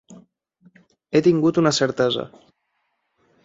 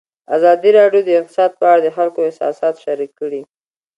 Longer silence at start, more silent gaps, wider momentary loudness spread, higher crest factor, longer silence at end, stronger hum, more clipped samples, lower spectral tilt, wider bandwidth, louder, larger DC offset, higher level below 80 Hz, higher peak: second, 0.1 s vs 0.3 s; neither; second, 8 LU vs 13 LU; first, 20 dB vs 14 dB; first, 1.15 s vs 0.55 s; neither; neither; about the same, -5 dB/octave vs -6 dB/octave; second, 7.8 kHz vs 10.5 kHz; second, -19 LUFS vs -14 LUFS; neither; first, -62 dBFS vs -70 dBFS; second, -4 dBFS vs 0 dBFS